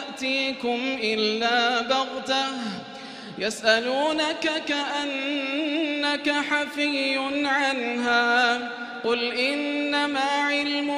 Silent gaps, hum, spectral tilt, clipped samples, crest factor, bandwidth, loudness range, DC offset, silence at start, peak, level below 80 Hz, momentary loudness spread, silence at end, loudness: none; none; -2.5 dB/octave; under 0.1%; 20 dB; 13 kHz; 2 LU; under 0.1%; 0 s; -4 dBFS; -70 dBFS; 7 LU; 0 s; -24 LUFS